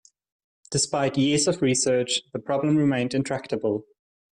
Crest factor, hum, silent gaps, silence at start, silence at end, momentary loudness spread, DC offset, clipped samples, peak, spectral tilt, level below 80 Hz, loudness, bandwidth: 14 dB; none; none; 0.7 s; 0.5 s; 7 LU; under 0.1%; under 0.1%; -10 dBFS; -4 dB/octave; -60 dBFS; -24 LUFS; 11.5 kHz